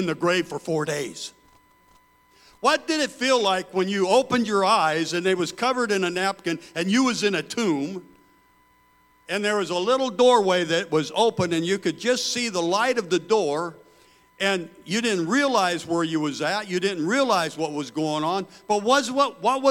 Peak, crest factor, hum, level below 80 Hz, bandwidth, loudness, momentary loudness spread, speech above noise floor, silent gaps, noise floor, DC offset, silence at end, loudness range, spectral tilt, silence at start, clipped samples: -6 dBFS; 18 dB; none; -68 dBFS; 16.5 kHz; -23 LUFS; 8 LU; 37 dB; none; -59 dBFS; under 0.1%; 0 s; 4 LU; -4 dB/octave; 0 s; under 0.1%